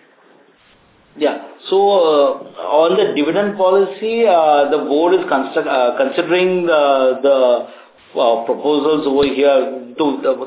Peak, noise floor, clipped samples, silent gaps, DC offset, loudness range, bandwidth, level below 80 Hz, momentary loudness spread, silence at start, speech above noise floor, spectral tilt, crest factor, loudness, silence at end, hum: 0 dBFS; -51 dBFS; under 0.1%; none; under 0.1%; 2 LU; 4 kHz; -58 dBFS; 7 LU; 1.15 s; 37 dB; -9 dB/octave; 14 dB; -15 LUFS; 0 s; none